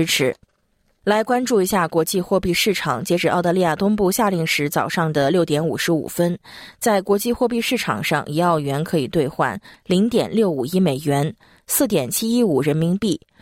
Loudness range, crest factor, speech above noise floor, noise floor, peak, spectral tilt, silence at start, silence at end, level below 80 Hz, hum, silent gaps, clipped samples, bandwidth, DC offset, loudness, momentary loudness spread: 2 LU; 14 dB; 45 dB; -65 dBFS; -6 dBFS; -5 dB/octave; 0 s; 0.25 s; -50 dBFS; none; none; under 0.1%; 16.5 kHz; under 0.1%; -20 LUFS; 4 LU